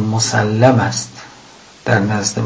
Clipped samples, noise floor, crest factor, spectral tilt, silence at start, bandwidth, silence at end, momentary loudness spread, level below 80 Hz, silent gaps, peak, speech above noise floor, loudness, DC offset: under 0.1%; -42 dBFS; 16 dB; -4.5 dB/octave; 0 s; 8 kHz; 0 s; 15 LU; -46 dBFS; none; 0 dBFS; 27 dB; -15 LUFS; under 0.1%